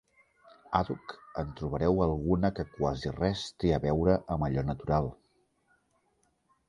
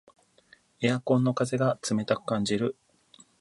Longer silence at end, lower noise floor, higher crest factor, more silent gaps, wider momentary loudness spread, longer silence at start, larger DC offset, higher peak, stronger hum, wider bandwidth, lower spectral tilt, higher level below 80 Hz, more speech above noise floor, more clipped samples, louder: first, 1.55 s vs 0.7 s; first, -73 dBFS vs -61 dBFS; about the same, 22 dB vs 18 dB; neither; first, 10 LU vs 5 LU; about the same, 0.7 s vs 0.8 s; neither; about the same, -10 dBFS vs -10 dBFS; neither; about the same, 11 kHz vs 11.5 kHz; first, -7.5 dB/octave vs -6 dB/octave; first, -44 dBFS vs -66 dBFS; first, 44 dB vs 34 dB; neither; second, -31 LUFS vs -27 LUFS